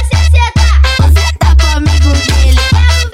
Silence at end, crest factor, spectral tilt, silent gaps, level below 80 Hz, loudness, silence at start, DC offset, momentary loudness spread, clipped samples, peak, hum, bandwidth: 0.05 s; 8 dB; -4.5 dB/octave; none; -10 dBFS; -9 LUFS; 0 s; under 0.1%; 1 LU; 0.3%; 0 dBFS; none; 14 kHz